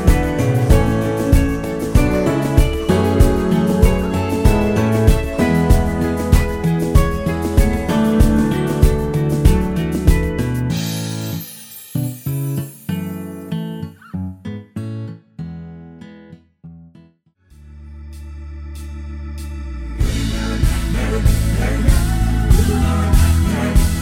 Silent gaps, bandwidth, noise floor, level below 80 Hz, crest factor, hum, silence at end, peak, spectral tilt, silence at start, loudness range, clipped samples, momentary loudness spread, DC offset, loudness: none; 19 kHz; -53 dBFS; -20 dBFS; 16 dB; none; 0 s; 0 dBFS; -6.5 dB/octave; 0 s; 17 LU; under 0.1%; 16 LU; under 0.1%; -17 LUFS